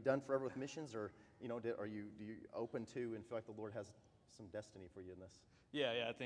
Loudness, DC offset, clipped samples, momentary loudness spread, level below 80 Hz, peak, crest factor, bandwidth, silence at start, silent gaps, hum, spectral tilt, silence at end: -47 LUFS; under 0.1%; under 0.1%; 17 LU; -80 dBFS; -24 dBFS; 22 dB; 10 kHz; 0 s; none; none; -5.5 dB/octave; 0 s